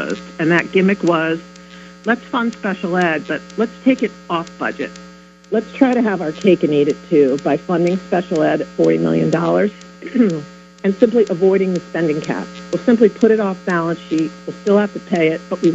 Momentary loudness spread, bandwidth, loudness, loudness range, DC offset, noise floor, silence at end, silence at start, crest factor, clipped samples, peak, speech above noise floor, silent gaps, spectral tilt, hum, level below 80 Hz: 9 LU; 8.2 kHz; -17 LUFS; 4 LU; under 0.1%; -38 dBFS; 0 s; 0 s; 16 dB; under 0.1%; 0 dBFS; 22 dB; none; -7 dB/octave; none; -56 dBFS